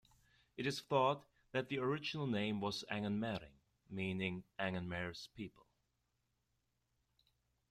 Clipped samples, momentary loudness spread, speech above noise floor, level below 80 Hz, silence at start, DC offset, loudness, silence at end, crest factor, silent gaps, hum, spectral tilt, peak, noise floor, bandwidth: under 0.1%; 13 LU; 44 dB; -74 dBFS; 0.55 s; under 0.1%; -41 LUFS; 2.2 s; 22 dB; none; none; -5.5 dB/octave; -20 dBFS; -84 dBFS; 14.5 kHz